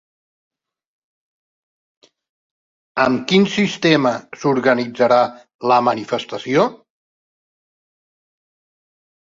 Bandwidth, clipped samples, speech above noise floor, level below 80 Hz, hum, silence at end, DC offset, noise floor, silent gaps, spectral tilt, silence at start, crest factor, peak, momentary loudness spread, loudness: 7.6 kHz; under 0.1%; over 73 dB; -62 dBFS; none; 2.6 s; under 0.1%; under -90 dBFS; 5.54-5.59 s; -5.5 dB/octave; 2.95 s; 20 dB; -2 dBFS; 8 LU; -17 LUFS